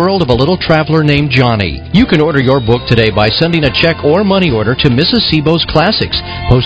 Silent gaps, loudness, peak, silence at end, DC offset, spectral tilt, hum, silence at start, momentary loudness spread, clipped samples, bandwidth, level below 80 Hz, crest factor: none; -10 LUFS; 0 dBFS; 0 s; 0.3%; -7.5 dB/octave; none; 0 s; 3 LU; 0.8%; 8 kHz; -26 dBFS; 10 dB